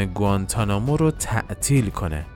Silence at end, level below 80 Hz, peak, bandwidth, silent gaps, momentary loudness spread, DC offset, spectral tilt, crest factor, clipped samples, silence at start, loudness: 0 s; -34 dBFS; -6 dBFS; 17 kHz; none; 5 LU; under 0.1%; -5.5 dB/octave; 16 dB; under 0.1%; 0 s; -22 LUFS